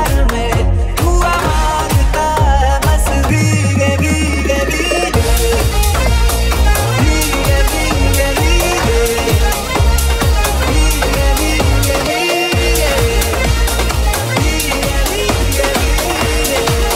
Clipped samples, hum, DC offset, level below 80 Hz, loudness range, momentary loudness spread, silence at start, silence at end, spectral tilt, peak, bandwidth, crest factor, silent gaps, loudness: under 0.1%; none; under 0.1%; -16 dBFS; 1 LU; 2 LU; 0 s; 0 s; -4 dB/octave; 0 dBFS; 16.5 kHz; 12 dB; none; -13 LUFS